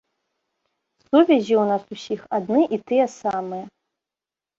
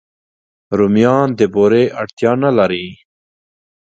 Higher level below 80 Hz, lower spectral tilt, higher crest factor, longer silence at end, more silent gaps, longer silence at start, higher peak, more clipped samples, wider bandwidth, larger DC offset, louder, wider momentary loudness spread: second, -68 dBFS vs -52 dBFS; second, -6 dB/octave vs -7.5 dB/octave; about the same, 20 dB vs 16 dB; about the same, 0.9 s vs 0.85 s; second, none vs 2.13-2.17 s; first, 1.15 s vs 0.7 s; about the same, -2 dBFS vs 0 dBFS; neither; about the same, 7.6 kHz vs 7.8 kHz; neither; second, -21 LUFS vs -14 LUFS; first, 14 LU vs 8 LU